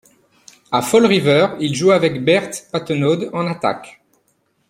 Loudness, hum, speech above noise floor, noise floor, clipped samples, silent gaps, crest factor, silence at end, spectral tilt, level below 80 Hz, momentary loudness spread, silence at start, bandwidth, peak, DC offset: -16 LUFS; none; 48 dB; -64 dBFS; under 0.1%; none; 16 dB; 0.8 s; -5 dB/octave; -58 dBFS; 9 LU; 0.7 s; 16.5 kHz; 0 dBFS; under 0.1%